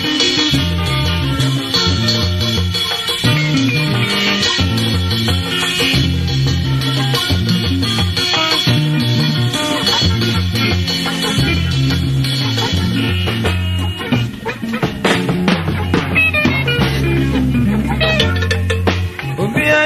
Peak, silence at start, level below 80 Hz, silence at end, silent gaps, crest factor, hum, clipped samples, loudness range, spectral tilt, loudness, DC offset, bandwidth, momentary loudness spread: 0 dBFS; 0 s; -30 dBFS; 0 s; none; 14 dB; none; under 0.1%; 2 LU; -4.5 dB/octave; -15 LUFS; under 0.1%; 14 kHz; 4 LU